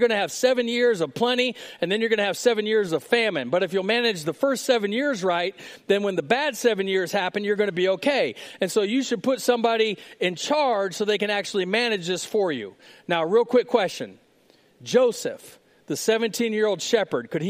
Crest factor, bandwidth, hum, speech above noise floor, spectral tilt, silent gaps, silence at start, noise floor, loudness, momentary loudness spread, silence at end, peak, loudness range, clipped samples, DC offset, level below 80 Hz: 20 dB; 16 kHz; none; 36 dB; -3.5 dB/octave; none; 0 s; -59 dBFS; -23 LUFS; 6 LU; 0 s; -4 dBFS; 2 LU; under 0.1%; under 0.1%; -76 dBFS